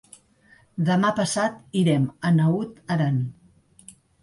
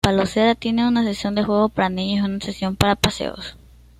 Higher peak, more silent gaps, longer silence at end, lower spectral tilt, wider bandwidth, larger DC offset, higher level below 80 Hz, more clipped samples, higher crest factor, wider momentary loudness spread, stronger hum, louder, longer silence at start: second, -10 dBFS vs 0 dBFS; neither; first, 0.9 s vs 0.45 s; about the same, -6.5 dB/octave vs -5.5 dB/octave; second, 11.5 kHz vs 15.5 kHz; neither; second, -62 dBFS vs -42 dBFS; neither; second, 14 dB vs 20 dB; about the same, 7 LU vs 9 LU; neither; second, -23 LUFS vs -20 LUFS; first, 0.75 s vs 0.05 s